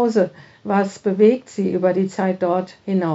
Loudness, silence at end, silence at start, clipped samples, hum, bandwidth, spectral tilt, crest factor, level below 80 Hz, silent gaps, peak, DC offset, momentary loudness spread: -20 LUFS; 0 s; 0 s; under 0.1%; none; 8 kHz; -7 dB/octave; 16 dB; -68 dBFS; none; -2 dBFS; under 0.1%; 8 LU